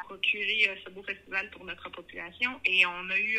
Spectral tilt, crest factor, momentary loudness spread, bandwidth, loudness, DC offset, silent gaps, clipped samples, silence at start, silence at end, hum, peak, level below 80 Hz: -2.5 dB/octave; 22 dB; 17 LU; 14 kHz; -27 LUFS; under 0.1%; none; under 0.1%; 0 s; 0 s; none; -8 dBFS; -66 dBFS